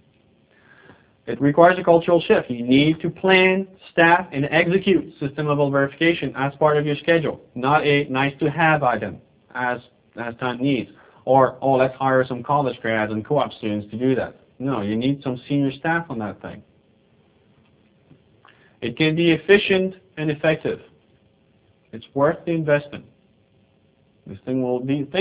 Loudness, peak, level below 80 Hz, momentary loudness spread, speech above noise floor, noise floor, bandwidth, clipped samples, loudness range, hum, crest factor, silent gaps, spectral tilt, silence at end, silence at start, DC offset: -20 LUFS; 0 dBFS; -56 dBFS; 15 LU; 40 dB; -59 dBFS; 4 kHz; under 0.1%; 9 LU; none; 20 dB; none; -10 dB/octave; 0 s; 1.25 s; under 0.1%